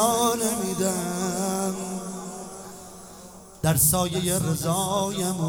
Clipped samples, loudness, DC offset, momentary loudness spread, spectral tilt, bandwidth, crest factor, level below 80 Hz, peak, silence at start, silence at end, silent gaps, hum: under 0.1%; -24 LUFS; under 0.1%; 22 LU; -4 dB/octave; over 20 kHz; 18 dB; -50 dBFS; -8 dBFS; 0 s; 0 s; none; none